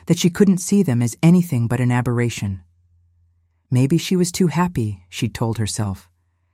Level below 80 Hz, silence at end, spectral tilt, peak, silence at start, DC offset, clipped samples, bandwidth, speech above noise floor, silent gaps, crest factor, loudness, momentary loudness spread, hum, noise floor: -50 dBFS; 0.55 s; -6 dB/octave; -2 dBFS; 0.1 s; under 0.1%; under 0.1%; 16 kHz; 43 dB; none; 16 dB; -19 LUFS; 11 LU; none; -61 dBFS